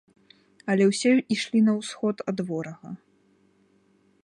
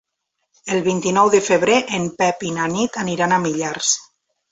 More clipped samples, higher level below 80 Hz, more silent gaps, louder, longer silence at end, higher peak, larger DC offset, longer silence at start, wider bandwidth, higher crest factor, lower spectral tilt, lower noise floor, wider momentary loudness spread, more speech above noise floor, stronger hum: neither; second, -74 dBFS vs -58 dBFS; neither; second, -24 LUFS vs -18 LUFS; first, 1.3 s vs 0.5 s; second, -10 dBFS vs -2 dBFS; neither; about the same, 0.65 s vs 0.65 s; first, 11 kHz vs 8.4 kHz; about the same, 16 dB vs 18 dB; first, -5.5 dB/octave vs -3.5 dB/octave; second, -63 dBFS vs -75 dBFS; first, 18 LU vs 8 LU; second, 39 dB vs 57 dB; neither